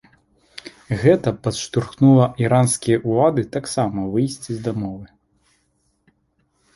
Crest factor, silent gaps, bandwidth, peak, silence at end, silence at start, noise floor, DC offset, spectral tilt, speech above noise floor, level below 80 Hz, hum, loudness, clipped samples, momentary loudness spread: 18 dB; none; 11.5 kHz; -2 dBFS; 1.7 s; 0.65 s; -66 dBFS; under 0.1%; -6.5 dB/octave; 48 dB; -50 dBFS; none; -19 LUFS; under 0.1%; 18 LU